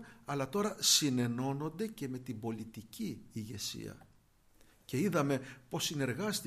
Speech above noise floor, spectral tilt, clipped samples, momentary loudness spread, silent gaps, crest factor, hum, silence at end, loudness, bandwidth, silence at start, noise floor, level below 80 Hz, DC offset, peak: 31 dB; -3.5 dB/octave; under 0.1%; 16 LU; none; 22 dB; none; 0 s; -35 LUFS; 15.5 kHz; 0 s; -66 dBFS; -68 dBFS; under 0.1%; -14 dBFS